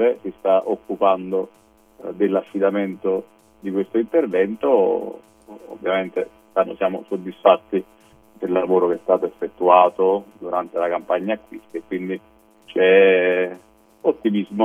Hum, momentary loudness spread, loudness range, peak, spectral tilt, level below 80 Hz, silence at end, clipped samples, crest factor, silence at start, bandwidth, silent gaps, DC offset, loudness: none; 14 LU; 4 LU; 0 dBFS; -7.5 dB/octave; -64 dBFS; 0 s; under 0.1%; 20 dB; 0 s; 3.6 kHz; none; under 0.1%; -20 LUFS